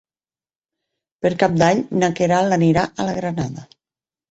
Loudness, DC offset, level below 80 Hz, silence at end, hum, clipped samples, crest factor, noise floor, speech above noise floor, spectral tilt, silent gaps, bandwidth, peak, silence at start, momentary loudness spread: -19 LUFS; under 0.1%; -52 dBFS; 0.65 s; none; under 0.1%; 18 dB; under -90 dBFS; over 72 dB; -6 dB/octave; none; 8.2 kHz; -2 dBFS; 1.25 s; 9 LU